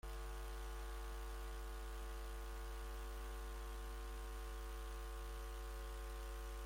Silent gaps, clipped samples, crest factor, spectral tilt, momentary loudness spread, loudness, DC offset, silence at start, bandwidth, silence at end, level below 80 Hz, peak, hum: none; under 0.1%; 8 dB; -4.5 dB/octave; 0 LU; -51 LUFS; under 0.1%; 0.05 s; 16.5 kHz; 0 s; -48 dBFS; -40 dBFS; none